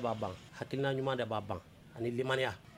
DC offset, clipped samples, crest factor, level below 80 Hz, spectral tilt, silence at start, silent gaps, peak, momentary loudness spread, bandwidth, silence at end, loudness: under 0.1%; under 0.1%; 20 dB; -66 dBFS; -6 dB/octave; 0 s; none; -16 dBFS; 11 LU; 16 kHz; 0 s; -37 LUFS